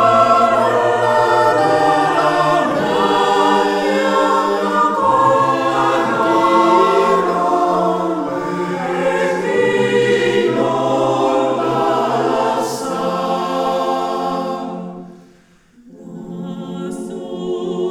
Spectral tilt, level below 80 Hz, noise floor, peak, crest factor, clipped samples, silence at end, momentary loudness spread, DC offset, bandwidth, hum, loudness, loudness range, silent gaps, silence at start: -5 dB/octave; -56 dBFS; -49 dBFS; 0 dBFS; 14 dB; under 0.1%; 0 s; 13 LU; 0.1%; 16 kHz; none; -15 LUFS; 9 LU; none; 0 s